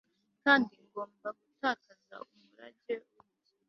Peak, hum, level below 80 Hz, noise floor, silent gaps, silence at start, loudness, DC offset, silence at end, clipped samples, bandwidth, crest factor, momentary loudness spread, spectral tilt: -10 dBFS; none; -78 dBFS; -69 dBFS; none; 0.45 s; -33 LUFS; under 0.1%; 0.7 s; under 0.1%; 6.2 kHz; 26 dB; 26 LU; -1 dB/octave